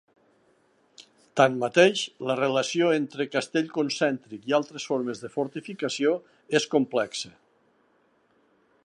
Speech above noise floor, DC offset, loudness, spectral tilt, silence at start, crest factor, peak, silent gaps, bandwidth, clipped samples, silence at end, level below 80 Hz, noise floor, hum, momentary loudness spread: 40 dB; under 0.1%; -26 LUFS; -4 dB/octave; 1 s; 24 dB; -4 dBFS; none; 11 kHz; under 0.1%; 1.55 s; -78 dBFS; -66 dBFS; none; 11 LU